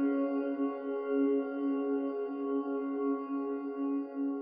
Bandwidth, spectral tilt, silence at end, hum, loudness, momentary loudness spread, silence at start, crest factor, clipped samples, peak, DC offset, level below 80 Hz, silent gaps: 3.2 kHz; -5 dB/octave; 0 s; none; -34 LUFS; 5 LU; 0 s; 12 dB; under 0.1%; -20 dBFS; under 0.1%; -88 dBFS; none